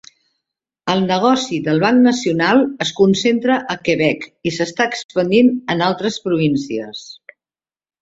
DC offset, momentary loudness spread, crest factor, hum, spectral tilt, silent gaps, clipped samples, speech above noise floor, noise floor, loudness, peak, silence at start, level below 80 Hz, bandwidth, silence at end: under 0.1%; 10 LU; 16 dB; none; -5 dB/octave; 5.04-5.09 s; under 0.1%; over 74 dB; under -90 dBFS; -16 LUFS; -2 dBFS; 0.85 s; -58 dBFS; 8 kHz; 0.9 s